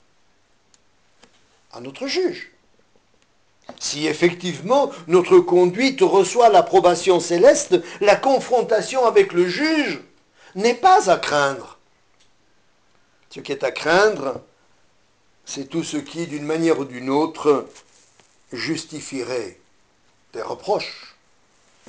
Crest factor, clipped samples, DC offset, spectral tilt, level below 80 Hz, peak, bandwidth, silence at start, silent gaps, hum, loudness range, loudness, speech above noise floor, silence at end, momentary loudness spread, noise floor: 16 dB; under 0.1%; under 0.1%; -4 dB/octave; -62 dBFS; -4 dBFS; 9.8 kHz; 1.75 s; none; none; 13 LU; -19 LUFS; 44 dB; 0.9 s; 18 LU; -62 dBFS